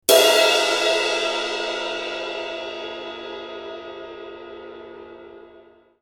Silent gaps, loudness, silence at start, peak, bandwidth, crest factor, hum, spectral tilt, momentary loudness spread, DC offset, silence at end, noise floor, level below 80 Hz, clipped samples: none; -20 LUFS; 0.1 s; 0 dBFS; 17 kHz; 24 dB; none; 0 dB/octave; 24 LU; under 0.1%; 0.45 s; -51 dBFS; -62 dBFS; under 0.1%